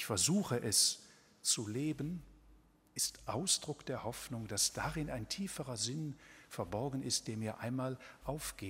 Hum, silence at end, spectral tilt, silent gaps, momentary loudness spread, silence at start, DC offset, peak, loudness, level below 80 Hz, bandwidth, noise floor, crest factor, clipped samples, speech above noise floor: none; 0 s; -3 dB/octave; none; 13 LU; 0 s; under 0.1%; -16 dBFS; -37 LUFS; -60 dBFS; 16 kHz; -65 dBFS; 22 dB; under 0.1%; 27 dB